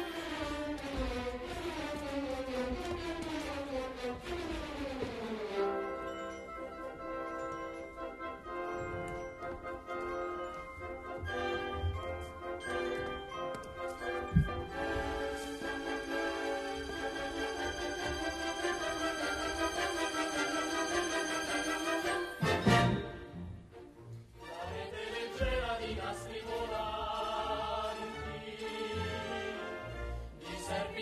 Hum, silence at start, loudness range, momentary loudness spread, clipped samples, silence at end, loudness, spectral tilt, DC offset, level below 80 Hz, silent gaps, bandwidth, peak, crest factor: none; 0 s; 7 LU; 10 LU; under 0.1%; 0 s; -37 LUFS; -4.5 dB/octave; under 0.1%; -50 dBFS; none; 13 kHz; -14 dBFS; 24 dB